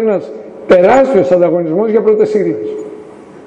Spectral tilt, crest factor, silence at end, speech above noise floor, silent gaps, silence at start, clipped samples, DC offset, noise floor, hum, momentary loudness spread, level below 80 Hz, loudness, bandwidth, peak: -7.5 dB/octave; 12 dB; 0 s; 23 dB; none; 0 s; under 0.1%; under 0.1%; -33 dBFS; none; 18 LU; -48 dBFS; -11 LUFS; 8.2 kHz; 0 dBFS